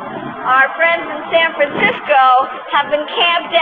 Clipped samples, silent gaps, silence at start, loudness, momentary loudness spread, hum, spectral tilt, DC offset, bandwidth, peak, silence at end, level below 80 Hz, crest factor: under 0.1%; none; 0 s; -13 LUFS; 7 LU; none; -5.5 dB/octave; under 0.1%; 4.8 kHz; -2 dBFS; 0 s; -58 dBFS; 14 dB